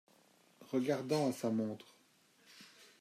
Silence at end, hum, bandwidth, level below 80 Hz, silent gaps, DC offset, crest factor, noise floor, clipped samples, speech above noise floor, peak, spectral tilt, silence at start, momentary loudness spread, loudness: 0.15 s; none; 15.5 kHz; -84 dBFS; none; under 0.1%; 18 dB; -69 dBFS; under 0.1%; 34 dB; -22 dBFS; -6 dB/octave; 0.6 s; 23 LU; -37 LUFS